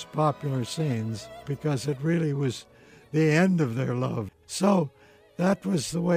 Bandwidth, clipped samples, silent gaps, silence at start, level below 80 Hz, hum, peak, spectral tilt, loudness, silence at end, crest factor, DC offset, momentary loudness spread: 15.5 kHz; under 0.1%; none; 0 s; -62 dBFS; none; -10 dBFS; -6.5 dB/octave; -27 LUFS; 0 s; 16 dB; under 0.1%; 12 LU